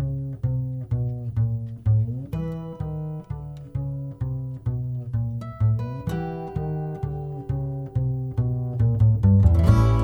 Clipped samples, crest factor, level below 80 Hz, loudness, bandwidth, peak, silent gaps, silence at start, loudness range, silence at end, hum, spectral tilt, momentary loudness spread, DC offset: under 0.1%; 20 dB; -34 dBFS; -25 LUFS; 6.2 kHz; -4 dBFS; none; 0 s; 7 LU; 0 s; none; -9.5 dB/octave; 14 LU; under 0.1%